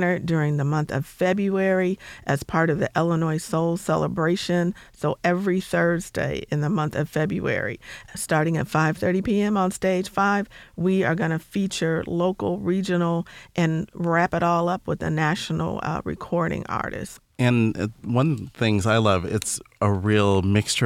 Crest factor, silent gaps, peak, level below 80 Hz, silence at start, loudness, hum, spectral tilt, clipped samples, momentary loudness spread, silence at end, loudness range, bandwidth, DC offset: 16 dB; none; -6 dBFS; -50 dBFS; 0 s; -23 LUFS; none; -6 dB/octave; under 0.1%; 7 LU; 0 s; 2 LU; 15.5 kHz; under 0.1%